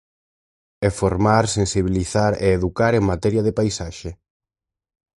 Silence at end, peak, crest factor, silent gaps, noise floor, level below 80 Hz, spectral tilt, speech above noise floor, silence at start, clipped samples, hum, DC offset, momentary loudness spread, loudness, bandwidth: 1.05 s; -2 dBFS; 20 dB; none; -87 dBFS; -38 dBFS; -6 dB/octave; 69 dB; 0.8 s; under 0.1%; none; under 0.1%; 9 LU; -20 LUFS; 11.5 kHz